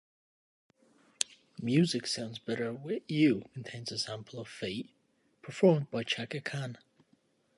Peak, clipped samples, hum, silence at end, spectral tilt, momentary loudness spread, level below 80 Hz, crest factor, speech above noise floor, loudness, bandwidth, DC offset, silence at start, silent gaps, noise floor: -6 dBFS; under 0.1%; none; 0.8 s; -5 dB/octave; 16 LU; -74 dBFS; 28 dB; 39 dB; -33 LUFS; 11.5 kHz; under 0.1%; 1.2 s; none; -71 dBFS